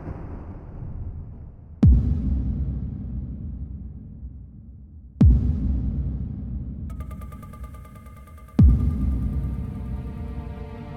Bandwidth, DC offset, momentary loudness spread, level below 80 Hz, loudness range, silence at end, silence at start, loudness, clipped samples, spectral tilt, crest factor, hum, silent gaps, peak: 3.2 kHz; under 0.1%; 25 LU; -26 dBFS; 2 LU; 0 s; 0 s; -25 LUFS; under 0.1%; -10.5 dB/octave; 18 dB; none; none; -6 dBFS